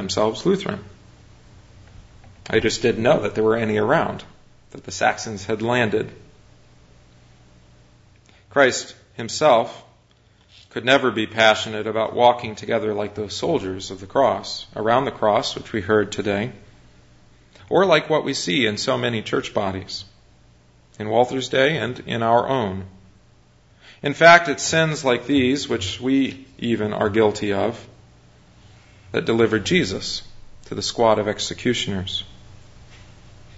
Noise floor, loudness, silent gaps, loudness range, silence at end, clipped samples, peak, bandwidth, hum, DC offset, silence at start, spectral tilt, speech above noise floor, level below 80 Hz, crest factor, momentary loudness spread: -56 dBFS; -20 LUFS; none; 6 LU; 0 s; under 0.1%; 0 dBFS; 8 kHz; none; under 0.1%; 0 s; -4.5 dB/octave; 36 dB; -52 dBFS; 22 dB; 13 LU